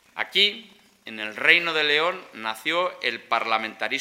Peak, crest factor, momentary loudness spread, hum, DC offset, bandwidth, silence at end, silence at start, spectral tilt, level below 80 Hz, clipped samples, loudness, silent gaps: 0 dBFS; 24 dB; 14 LU; none; under 0.1%; 16 kHz; 0 s; 0.15 s; -2 dB/octave; -78 dBFS; under 0.1%; -22 LUFS; none